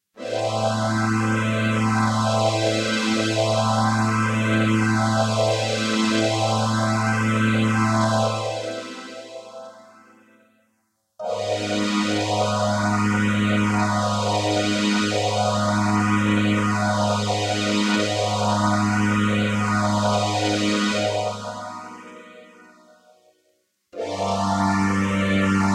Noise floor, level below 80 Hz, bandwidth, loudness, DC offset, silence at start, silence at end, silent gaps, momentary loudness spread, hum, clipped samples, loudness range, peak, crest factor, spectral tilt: -70 dBFS; -54 dBFS; 12.5 kHz; -21 LUFS; under 0.1%; 0.15 s; 0 s; none; 10 LU; none; under 0.1%; 8 LU; -8 dBFS; 14 dB; -5 dB/octave